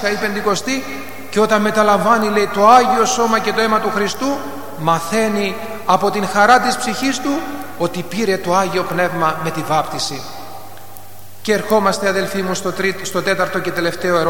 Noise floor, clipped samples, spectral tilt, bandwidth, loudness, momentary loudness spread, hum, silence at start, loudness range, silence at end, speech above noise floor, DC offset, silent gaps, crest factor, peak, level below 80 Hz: -39 dBFS; under 0.1%; -4 dB/octave; 17.5 kHz; -16 LUFS; 11 LU; none; 0 s; 6 LU; 0 s; 23 dB; 3%; none; 16 dB; 0 dBFS; -54 dBFS